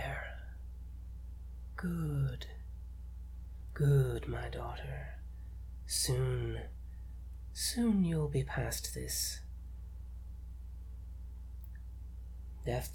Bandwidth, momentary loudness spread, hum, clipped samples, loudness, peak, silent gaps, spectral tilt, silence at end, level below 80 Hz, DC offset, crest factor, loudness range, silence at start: 18.5 kHz; 18 LU; none; under 0.1%; -36 LUFS; -20 dBFS; none; -5 dB/octave; 0 s; -46 dBFS; under 0.1%; 18 dB; 8 LU; 0 s